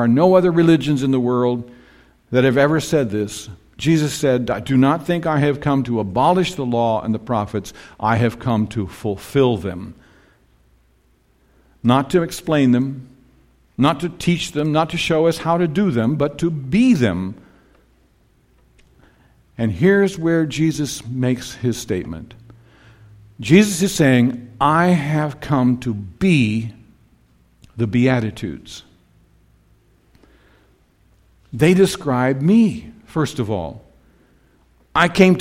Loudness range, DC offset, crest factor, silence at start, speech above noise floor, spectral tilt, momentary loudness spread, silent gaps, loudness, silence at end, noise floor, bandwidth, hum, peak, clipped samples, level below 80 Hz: 6 LU; under 0.1%; 18 dB; 0 s; 41 dB; -6.5 dB/octave; 13 LU; none; -18 LUFS; 0 s; -58 dBFS; 16 kHz; none; 0 dBFS; under 0.1%; -48 dBFS